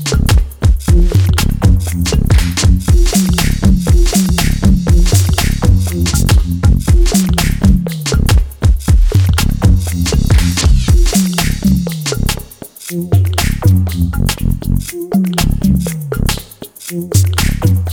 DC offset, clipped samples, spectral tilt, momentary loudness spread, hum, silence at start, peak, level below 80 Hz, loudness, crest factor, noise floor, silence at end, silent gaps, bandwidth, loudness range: under 0.1%; under 0.1%; -5 dB/octave; 6 LU; none; 0 s; 0 dBFS; -14 dBFS; -13 LUFS; 10 dB; -31 dBFS; 0 s; none; 19.5 kHz; 3 LU